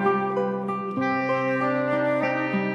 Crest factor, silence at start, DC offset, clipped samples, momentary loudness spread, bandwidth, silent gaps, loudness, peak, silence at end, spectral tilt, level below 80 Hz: 12 dB; 0 s; under 0.1%; under 0.1%; 4 LU; 9 kHz; none; -24 LUFS; -12 dBFS; 0 s; -8 dB/octave; -72 dBFS